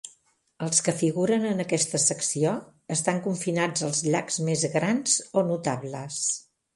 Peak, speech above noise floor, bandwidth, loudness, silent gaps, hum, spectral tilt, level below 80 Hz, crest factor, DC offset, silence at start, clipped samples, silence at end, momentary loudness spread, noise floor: -6 dBFS; 38 dB; 11.5 kHz; -25 LUFS; none; none; -4 dB/octave; -68 dBFS; 20 dB; under 0.1%; 0.05 s; under 0.1%; 0.35 s; 7 LU; -64 dBFS